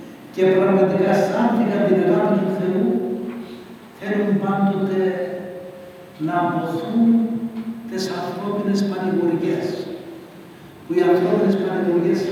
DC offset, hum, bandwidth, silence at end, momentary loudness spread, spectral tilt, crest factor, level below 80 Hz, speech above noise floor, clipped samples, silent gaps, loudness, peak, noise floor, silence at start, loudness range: under 0.1%; none; 15.5 kHz; 0 s; 17 LU; -7.5 dB/octave; 16 dB; -66 dBFS; 22 dB; under 0.1%; none; -20 LUFS; -4 dBFS; -41 dBFS; 0 s; 5 LU